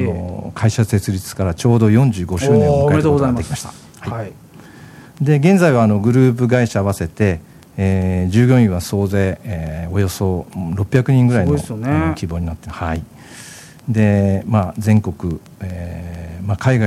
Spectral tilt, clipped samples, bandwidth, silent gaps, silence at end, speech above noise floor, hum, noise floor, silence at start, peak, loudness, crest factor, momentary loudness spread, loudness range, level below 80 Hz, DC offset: -7.5 dB/octave; under 0.1%; 14.5 kHz; none; 0 s; 24 dB; none; -39 dBFS; 0 s; 0 dBFS; -16 LUFS; 16 dB; 15 LU; 4 LU; -38 dBFS; under 0.1%